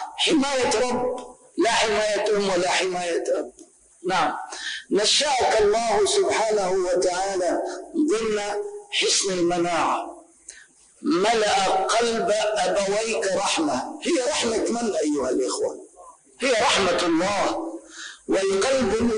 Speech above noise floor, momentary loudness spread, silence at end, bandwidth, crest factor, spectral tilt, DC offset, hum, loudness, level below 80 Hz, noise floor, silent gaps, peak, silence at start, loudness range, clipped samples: 29 dB; 10 LU; 0 s; 10.5 kHz; 12 dB; -2.5 dB/octave; under 0.1%; none; -22 LUFS; -54 dBFS; -51 dBFS; none; -10 dBFS; 0 s; 3 LU; under 0.1%